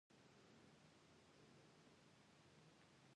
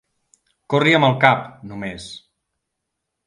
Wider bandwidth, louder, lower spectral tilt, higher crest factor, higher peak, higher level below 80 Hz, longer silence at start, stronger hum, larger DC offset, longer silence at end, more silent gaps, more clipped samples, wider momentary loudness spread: about the same, 10 kHz vs 11 kHz; second, -70 LUFS vs -16 LUFS; second, -4.5 dB/octave vs -6 dB/octave; second, 14 dB vs 22 dB; second, -58 dBFS vs 0 dBFS; second, under -90 dBFS vs -58 dBFS; second, 0.1 s vs 0.7 s; neither; neither; second, 0 s vs 1.1 s; neither; neither; second, 1 LU vs 21 LU